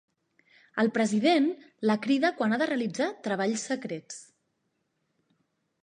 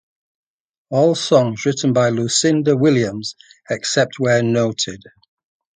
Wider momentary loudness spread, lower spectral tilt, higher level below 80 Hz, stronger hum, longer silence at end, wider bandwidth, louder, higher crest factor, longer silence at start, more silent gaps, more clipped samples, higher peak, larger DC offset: first, 13 LU vs 9 LU; about the same, -4.5 dB/octave vs -4.5 dB/octave; second, -82 dBFS vs -58 dBFS; neither; first, 1.6 s vs 0.8 s; about the same, 10 kHz vs 9.6 kHz; second, -28 LUFS vs -17 LUFS; about the same, 18 dB vs 18 dB; second, 0.75 s vs 0.9 s; neither; neither; second, -12 dBFS vs 0 dBFS; neither